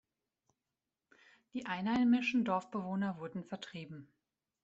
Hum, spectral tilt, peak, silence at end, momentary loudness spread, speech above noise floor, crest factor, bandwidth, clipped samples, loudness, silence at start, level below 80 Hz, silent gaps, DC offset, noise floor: none; -6.5 dB/octave; -20 dBFS; 0.6 s; 17 LU; over 55 dB; 18 dB; 7.8 kHz; under 0.1%; -35 LUFS; 1.55 s; -74 dBFS; none; under 0.1%; under -90 dBFS